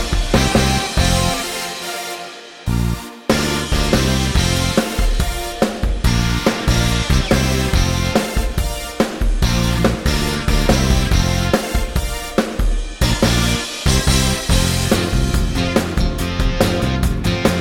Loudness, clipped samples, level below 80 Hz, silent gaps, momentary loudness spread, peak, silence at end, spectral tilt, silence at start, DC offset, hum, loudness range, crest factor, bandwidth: -18 LUFS; under 0.1%; -22 dBFS; none; 7 LU; -2 dBFS; 0 s; -4.5 dB/octave; 0 s; under 0.1%; none; 2 LU; 16 dB; 17.5 kHz